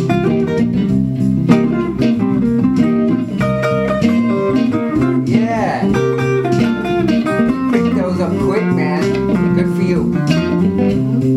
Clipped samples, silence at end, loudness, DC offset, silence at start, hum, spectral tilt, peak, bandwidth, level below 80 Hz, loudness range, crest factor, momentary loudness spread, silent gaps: under 0.1%; 0 s; -15 LUFS; under 0.1%; 0 s; none; -8 dB/octave; 0 dBFS; 12 kHz; -38 dBFS; 1 LU; 14 dB; 2 LU; none